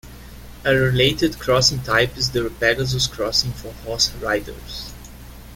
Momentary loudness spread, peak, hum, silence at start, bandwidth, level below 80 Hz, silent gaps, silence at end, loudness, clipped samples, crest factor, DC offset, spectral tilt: 16 LU; -2 dBFS; none; 0.05 s; 17 kHz; -38 dBFS; none; 0 s; -19 LUFS; under 0.1%; 20 dB; under 0.1%; -3.5 dB/octave